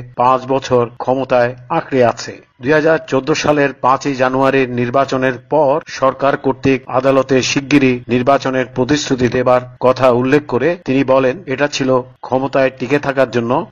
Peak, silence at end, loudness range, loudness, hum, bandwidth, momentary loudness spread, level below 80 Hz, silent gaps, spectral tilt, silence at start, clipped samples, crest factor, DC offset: 0 dBFS; 0.05 s; 1 LU; -14 LUFS; none; 7.6 kHz; 5 LU; -46 dBFS; none; -5.5 dB/octave; 0 s; under 0.1%; 14 dB; under 0.1%